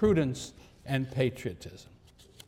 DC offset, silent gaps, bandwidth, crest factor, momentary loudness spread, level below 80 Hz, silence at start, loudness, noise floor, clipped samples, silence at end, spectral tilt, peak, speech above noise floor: under 0.1%; none; 15.5 kHz; 18 dB; 20 LU; -52 dBFS; 0 s; -31 LUFS; -55 dBFS; under 0.1%; 0.65 s; -6.5 dB/octave; -14 dBFS; 25 dB